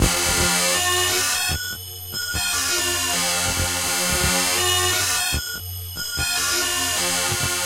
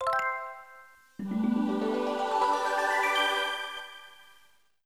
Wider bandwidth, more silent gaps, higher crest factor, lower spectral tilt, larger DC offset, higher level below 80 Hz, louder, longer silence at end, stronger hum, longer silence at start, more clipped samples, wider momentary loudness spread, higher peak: about the same, 16 kHz vs 15.5 kHz; neither; about the same, 16 dB vs 16 dB; second, -1.5 dB/octave vs -4 dB/octave; second, under 0.1% vs 0.1%; first, -36 dBFS vs -72 dBFS; first, -19 LUFS vs -28 LUFS; second, 0 s vs 0.65 s; neither; about the same, 0 s vs 0 s; neither; second, 9 LU vs 17 LU; first, -6 dBFS vs -14 dBFS